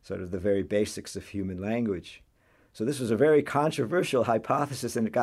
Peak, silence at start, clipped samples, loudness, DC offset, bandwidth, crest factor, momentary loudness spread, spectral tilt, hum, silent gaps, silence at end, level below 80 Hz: -10 dBFS; 0.1 s; under 0.1%; -28 LUFS; under 0.1%; 14 kHz; 18 dB; 12 LU; -6 dB/octave; none; none; 0 s; -60 dBFS